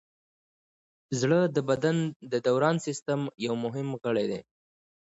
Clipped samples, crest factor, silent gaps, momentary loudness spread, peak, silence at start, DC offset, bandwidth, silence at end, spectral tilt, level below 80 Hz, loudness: under 0.1%; 18 dB; 2.16-2.20 s, 3.02-3.06 s; 8 LU; -10 dBFS; 1.1 s; under 0.1%; 8 kHz; 0.65 s; -6 dB/octave; -70 dBFS; -28 LUFS